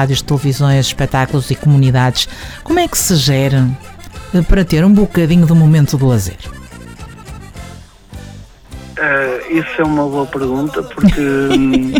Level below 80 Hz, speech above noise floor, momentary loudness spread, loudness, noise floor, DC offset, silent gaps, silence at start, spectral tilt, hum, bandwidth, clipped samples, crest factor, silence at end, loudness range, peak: -28 dBFS; 22 dB; 22 LU; -13 LUFS; -34 dBFS; under 0.1%; none; 0 s; -5.5 dB/octave; none; over 20 kHz; under 0.1%; 12 dB; 0 s; 9 LU; -2 dBFS